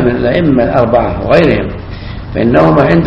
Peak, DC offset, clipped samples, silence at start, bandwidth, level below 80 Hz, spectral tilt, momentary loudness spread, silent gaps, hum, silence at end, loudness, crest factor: 0 dBFS; under 0.1%; 0.6%; 0 s; 7.2 kHz; -28 dBFS; -9 dB/octave; 15 LU; none; none; 0 s; -10 LUFS; 10 dB